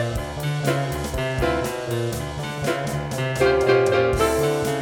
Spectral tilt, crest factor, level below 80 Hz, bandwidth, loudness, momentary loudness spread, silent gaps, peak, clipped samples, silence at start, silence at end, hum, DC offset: -5.5 dB/octave; 16 dB; -36 dBFS; 19 kHz; -22 LUFS; 9 LU; none; -6 dBFS; under 0.1%; 0 s; 0 s; none; under 0.1%